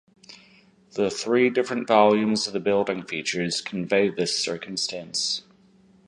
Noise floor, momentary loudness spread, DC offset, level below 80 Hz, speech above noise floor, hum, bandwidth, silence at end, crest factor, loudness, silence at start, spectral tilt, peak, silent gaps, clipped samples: -57 dBFS; 9 LU; under 0.1%; -66 dBFS; 33 dB; none; 11.5 kHz; 0.65 s; 22 dB; -24 LUFS; 0.3 s; -3.5 dB/octave; -4 dBFS; none; under 0.1%